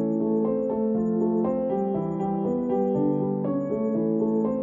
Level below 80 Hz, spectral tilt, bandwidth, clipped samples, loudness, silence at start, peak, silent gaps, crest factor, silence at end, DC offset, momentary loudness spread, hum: -58 dBFS; -12 dB/octave; 3.4 kHz; under 0.1%; -25 LUFS; 0 s; -12 dBFS; none; 12 dB; 0 s; under 0.1%; 3 LU; none